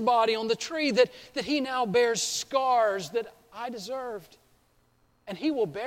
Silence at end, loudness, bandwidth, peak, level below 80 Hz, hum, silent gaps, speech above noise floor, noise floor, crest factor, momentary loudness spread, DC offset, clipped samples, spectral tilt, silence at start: 0 s; -27 LUFS; 16.5 kHz; -8 dBFS; -68 dBFS; none; none; 39 dB; -66 dBFS; 20 dB; 14 LU; under 0.1%; under 0.1%; -3 dB/octave; 0 s